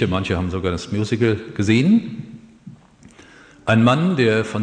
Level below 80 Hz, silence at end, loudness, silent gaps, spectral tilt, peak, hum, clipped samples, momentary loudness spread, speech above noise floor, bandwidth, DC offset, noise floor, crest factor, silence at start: -46 dBFS; 0 s; -19 LUFS; none; -6.5 dB/octave; -2 dBFS; none; under 0.1%; 12 LU; 29 dB; 9.8 kHz; under 0.1%; -47 dBFS; 18 dB; 0 s